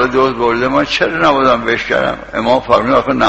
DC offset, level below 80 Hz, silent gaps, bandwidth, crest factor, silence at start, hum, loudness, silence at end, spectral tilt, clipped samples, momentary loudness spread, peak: 0.4%; -38 dBFS; none; 8.2 kHz; 12 dB; 0 s; none; -13 LUFS; 0 s; -5 dB/octave; under 0.1%; 4 LU; 0 dBFS